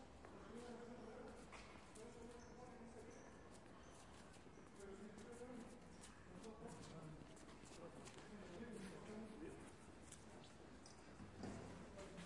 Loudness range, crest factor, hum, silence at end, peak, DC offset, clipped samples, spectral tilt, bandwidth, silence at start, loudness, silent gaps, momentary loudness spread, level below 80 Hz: 3 LU; 20 dB; none; 0 s; -38 dBFS; under 0.1%; under 0.1%; -5 dB/octave; 12 kHz; 0 s; -59 LUFS; none; 6 LU; -72 dBFS